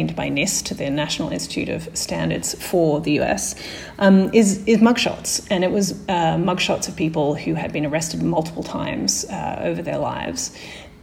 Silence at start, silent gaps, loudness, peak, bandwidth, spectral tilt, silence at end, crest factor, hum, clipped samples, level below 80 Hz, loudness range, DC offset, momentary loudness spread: 0 s; none; -21 LUFS; -2 dBFS; 16.5 kHz; -4.5 dB/octave; 0.1 s; 18 dB; none; under 0.1%; -46 dBFS; 5 LU; under 0.1%; 10 LU